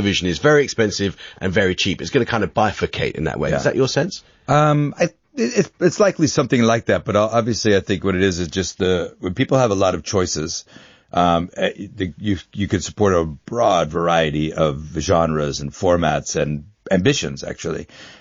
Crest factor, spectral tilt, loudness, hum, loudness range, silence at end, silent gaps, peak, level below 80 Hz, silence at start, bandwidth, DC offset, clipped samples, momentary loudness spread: 16 dB; -4.5 dB/octave; -19 LUFS; none; 3 LU; 0.1 s; none; -2 dBFS; -42 dBFS; 0 s; 7.4 kHz; under 0.1%; under 0.1%; 9 LU